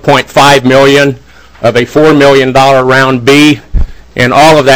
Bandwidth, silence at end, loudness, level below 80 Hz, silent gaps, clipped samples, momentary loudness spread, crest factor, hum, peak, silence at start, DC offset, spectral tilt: over 20 kHz; 0 s; -5 LUFS; -22 dBFS; none; 20%; 9 LU; 6 dB; none; 0 dBFS; 0.05 s; 3%; -5 dB/octave